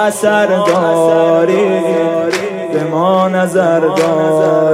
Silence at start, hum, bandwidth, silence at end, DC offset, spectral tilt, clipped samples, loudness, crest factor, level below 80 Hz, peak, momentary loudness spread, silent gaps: 0 s; none; 16 kHz; 0 s; under 0.1%; -5.5 dB/octave; under 0.1%; -12 LUFS; 12 dB; -62 dBFS; 0 dBFS; 5 LU; none